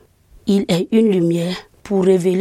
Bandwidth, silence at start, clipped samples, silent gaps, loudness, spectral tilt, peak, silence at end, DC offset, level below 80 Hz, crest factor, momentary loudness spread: 14 kHz; 0.45 s; under 0.1%; none; -17 LUFS; -7 dB/octave; -2 dBFS; 0 s; under 0.1%; -52 dBFS; 14 dB; 10 LU